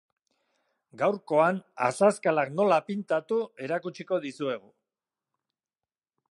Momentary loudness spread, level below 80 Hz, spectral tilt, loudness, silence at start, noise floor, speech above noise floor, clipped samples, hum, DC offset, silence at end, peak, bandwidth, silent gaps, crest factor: 9 LU; -84 dBFS; -5.5 dB/octave; -27 LUFS; 0.95 s; under -90 dBFS; over 63 dB; under 0.1%; none; under 0.1%; 1.75 s; -8 dBFS; 11.5 kHz; none; 20 dB